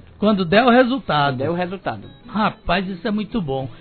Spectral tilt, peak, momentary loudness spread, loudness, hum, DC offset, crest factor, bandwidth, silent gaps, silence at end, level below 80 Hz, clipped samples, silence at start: -9.5 dB/octave; 0 dBFS; 13 LU; -19 LUFS; none; under 0.1%; 18 dB; 4.6 kHz; none; 0 s; -42 dBFS; under 0.1%; 0.2 s